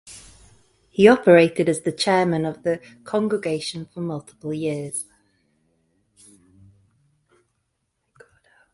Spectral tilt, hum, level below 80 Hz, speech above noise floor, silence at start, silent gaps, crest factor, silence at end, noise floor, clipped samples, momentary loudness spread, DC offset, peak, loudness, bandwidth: -5.5 dB/octave; none; -60 dBFS; 54 dB; 0.05 s; none; 22 dB; 3.7 s; -74 dBFS; under 0.1%; 17 LU; under 0.1%; 0 dBFS; -21 LUFS; 11.5 kHz